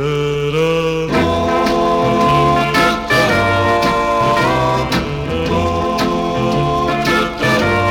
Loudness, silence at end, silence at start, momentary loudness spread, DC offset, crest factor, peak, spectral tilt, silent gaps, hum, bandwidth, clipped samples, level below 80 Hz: -15 LUFS; 0 s; 0 s; 4 LU; under 0.1%; 12 dB; -2 dBFS; -5.5 dB/octave; none; none; 19 kHz; under 0.1%; -34 dBFS